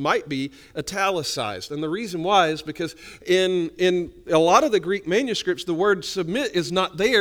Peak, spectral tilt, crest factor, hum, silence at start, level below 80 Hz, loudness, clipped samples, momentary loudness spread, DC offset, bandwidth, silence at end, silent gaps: -4 dBFS; -4 dB/octave; 18 dB; none; 0 s; -54 dBFS; -22 LUFS; under 0.1%; 11 LU; under 0.1%; 18 kHz; 0 s; none